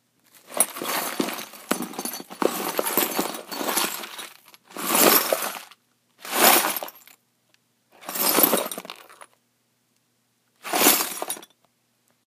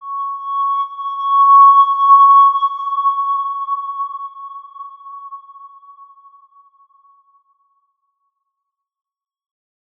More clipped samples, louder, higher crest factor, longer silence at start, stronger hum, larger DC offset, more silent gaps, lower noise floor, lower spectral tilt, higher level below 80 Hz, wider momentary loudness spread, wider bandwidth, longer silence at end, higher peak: neither; second, -22 LUFS vs -12 LUFS; first, 26 dB vs 16 dB; first, 0.5 s vs 0 s; neither; neither; neither; second, -69 dBFS vs -80 dBFS; first, -1 dB/octave vs 1 dB/octave; first, -78 dBFS vs -90 dBFS; second, 22 LU vs 26 LU; first, 15.5 kHz vs 3.6 kHz; second, 0.8 s vs 4.35 s; about the same, 0 dBFS vs -2 dBFS